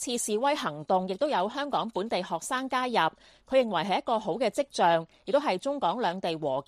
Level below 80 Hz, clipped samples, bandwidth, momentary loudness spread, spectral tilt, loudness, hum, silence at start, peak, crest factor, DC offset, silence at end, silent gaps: -68 dBFS; under 0.1%; 14 kHz; 5 LU; -3.5 dB/octave; -28 LUFS; none; 0 s; -12 dBFS; 16 dB; under 0.1%; 0.05 s; none